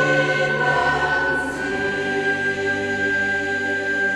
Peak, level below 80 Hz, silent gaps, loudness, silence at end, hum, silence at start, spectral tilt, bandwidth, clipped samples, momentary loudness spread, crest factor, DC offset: -6 dBFS; -48 dBFS; none; -20 LUFS; 0 s; none; 0 s; -4.5 dB/octave; 12.5 kHz; under 0.1%; 4 LU; 14 dB; under 0.1%